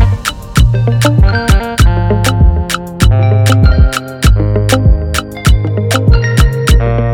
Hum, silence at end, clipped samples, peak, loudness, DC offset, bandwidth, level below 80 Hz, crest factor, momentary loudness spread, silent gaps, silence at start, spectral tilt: none; 0 s; under 0.1%; 0 dBFS; -11 LUFS; under 0.1%; 17.5 kHz; -12 dBFS; 8 dB; 4 LU; none; 0 s; -5.5 dB/octave